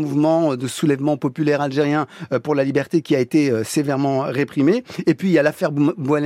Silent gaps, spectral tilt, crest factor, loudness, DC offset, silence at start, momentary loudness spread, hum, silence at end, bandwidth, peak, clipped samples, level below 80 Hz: none; -6.5 dB/octave; 16 dB; -19 LUFS; under 0.1%; 0 s; 4 LU; none; 0 s; 15 kHz; -4 dBFS; under 0.1%; -64 dBFS